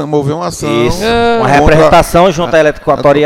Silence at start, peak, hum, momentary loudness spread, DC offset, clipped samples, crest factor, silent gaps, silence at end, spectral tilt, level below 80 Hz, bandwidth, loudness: 0 s; 0 dBFS; none; 8 LU; under 0.1%; 1%; 8 dB; none; 0 s; -5.5 dB/octave; -24 dBFS; 16.5 kHz; -9 LUFS